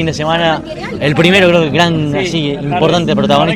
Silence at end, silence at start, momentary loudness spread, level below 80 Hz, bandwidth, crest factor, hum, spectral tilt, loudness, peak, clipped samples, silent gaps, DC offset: 0 s; 0 s; 8 LU; -38 dBFS; 13 kHz; 12 dB; none; -5.5 dB/octave; -12 LUFS; 0 dBFS; 0.5%; none; under 0.1%